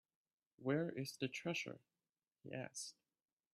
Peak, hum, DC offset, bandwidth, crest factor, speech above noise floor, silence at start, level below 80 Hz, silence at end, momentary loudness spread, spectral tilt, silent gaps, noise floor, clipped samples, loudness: -26 dBFS; none; under 0.1%; 14.5 kHz; 20 dB; over 46 dB; 0.6 s; -86 dBFS; 0.65 s; 12 LU; -4.5 dB/octave; none; under -90 dBFS; under 0.1%; -45 LUFS